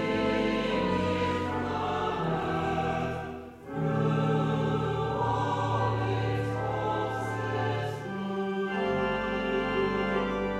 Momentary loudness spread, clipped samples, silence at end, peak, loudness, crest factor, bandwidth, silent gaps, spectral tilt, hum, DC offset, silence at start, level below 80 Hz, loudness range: 5 LU; under 0.1%; 0 s; -14 dBFS; -29 LUFS; 16 dB; 12 kHz; none; -7 dB/octave; none; under 0.1%; 0 s; -50 dBFS; 2 LU